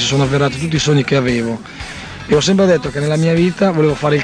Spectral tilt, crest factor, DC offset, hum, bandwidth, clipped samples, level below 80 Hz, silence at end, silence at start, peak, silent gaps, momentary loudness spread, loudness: -5.5 dB/octave; 12 dB; under 0.1%; none; 10.5 kHz; under 0.1%; -40 dBFS; 0 s; 0 s; -2 dBFS; none; 14 LU; -14 LUFS